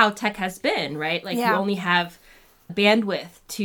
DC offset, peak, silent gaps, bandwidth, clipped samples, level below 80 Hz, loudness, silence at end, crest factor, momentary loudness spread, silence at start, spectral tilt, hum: under 0.1%; -2 dBFS; none; 20 kHz; under 0.1%; -60 dBFS; -23 LUFS; 0 s; 20 dB; 12 LU; 0 s; -4.5 dB/octave; none